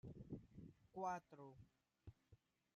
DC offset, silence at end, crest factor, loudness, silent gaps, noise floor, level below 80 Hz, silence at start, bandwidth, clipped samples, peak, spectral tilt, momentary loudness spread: under 0.1%; 0.4 s; 20 dB; -54 LUFS; none; -75 dBFS; -74 dBFS; 0.05 s; 11.5 kHz; under 0.1%; -36 dBFS; -7 dB/octave; 19 LU